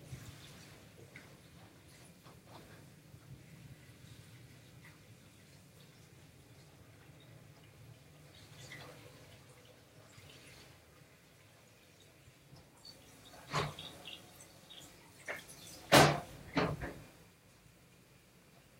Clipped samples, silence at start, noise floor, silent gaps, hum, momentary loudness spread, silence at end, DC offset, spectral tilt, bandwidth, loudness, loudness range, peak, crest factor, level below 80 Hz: under 0.1%; 0 s; -63 dBFS; none; none; 21 LU; 1.75 s; under 0.1%; -4 dB/octave; 16 kHz; -34 LUFS; 25 LU; -10 dBFS; 32 dB; -66 dBFS